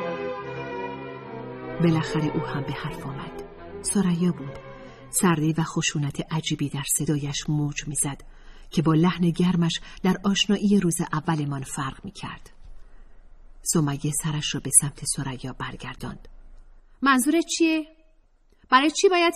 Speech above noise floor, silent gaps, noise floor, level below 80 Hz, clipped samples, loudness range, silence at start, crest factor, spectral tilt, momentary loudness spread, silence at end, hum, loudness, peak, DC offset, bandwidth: 34 dB; none; -58 dBFS; -48 dBFS; under 0.1%; 5 LU; 0 s; 22 dB; -4.5 dB/octave; 17 LU; 0 s; none; -24 LUFS; -4 dBFS; under 0.1%; 15 kHz